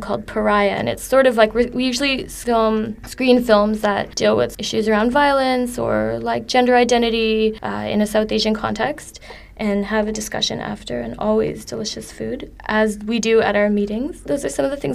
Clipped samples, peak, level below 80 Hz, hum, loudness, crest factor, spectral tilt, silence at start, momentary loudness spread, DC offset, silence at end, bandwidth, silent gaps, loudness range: under 0.1%; 0 dBFS; -42 dBFS; none; -19 LUFS; 18 dB; -4.5 dB/octave; 0 s; 11 LU; under 0.1%; 0 s; 15 kHz; none; 5 LU